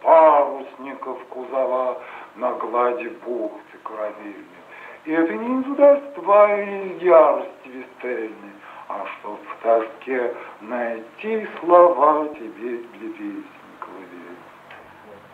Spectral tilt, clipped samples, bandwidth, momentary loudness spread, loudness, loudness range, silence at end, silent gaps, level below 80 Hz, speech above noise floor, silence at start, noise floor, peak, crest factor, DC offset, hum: -7 dB/octave; under 0.1%; 4.5 kHz; 24 LU; -20 LUFS; 9 LU; 0.15 s; none; -78 dBFS; 23 dB; 0 s; -44 dBFS; 0 dBFS; 20 dB; under 0.1%; none